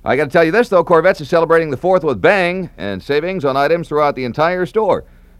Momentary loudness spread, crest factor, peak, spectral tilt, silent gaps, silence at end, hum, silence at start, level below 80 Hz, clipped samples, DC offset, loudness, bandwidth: 6 LU; 14 dB; 0 dBFS; -6.5 dB/octave; none; 0.35 s; none; 0.05 s; -44 dBFS; under 0.1%; under 0.1%; -15 LUFS; 13 kHz